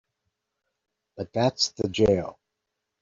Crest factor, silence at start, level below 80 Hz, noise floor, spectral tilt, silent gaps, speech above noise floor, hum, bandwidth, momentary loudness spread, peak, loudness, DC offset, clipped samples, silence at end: 20 dB; 1.15 s; -54 dBFS; -83 dBFS; -4.5 dB/octave; none; 58 dB; none; 7.8 kHz; 15 LU; -8 dBFS; -25 LUFS; under 0.1%; under 0.1%; 0.7 s